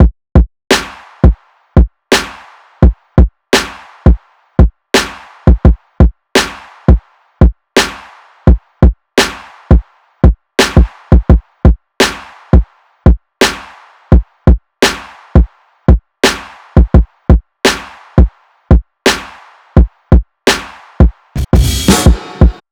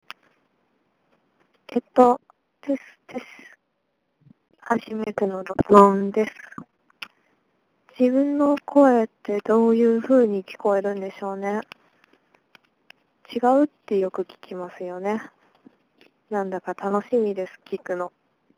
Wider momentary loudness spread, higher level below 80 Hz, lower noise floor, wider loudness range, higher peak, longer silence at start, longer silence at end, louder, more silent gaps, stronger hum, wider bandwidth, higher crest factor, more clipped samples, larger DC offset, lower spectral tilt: second, 8 LU vs 20 LU; first, -14 dBFS vs -62 dBFS; second, -38 dBFS vs -74 dBFS; second, 2 LU vs 9 LU; about the same, 0 dBFS vs 0 dBFS; second, 0 s vs 1.7 s; second, 0.2 s vs 0.5 s; first, -12 LUFS vs -22 LUFS; neither; neither; first, 17.5 kHz vs 11 kHz; second, 10 dB vs 24 dB; first, 3% vs under 0.1%; neither; second, -5.5 dB/octave vs -7.5 dB/octave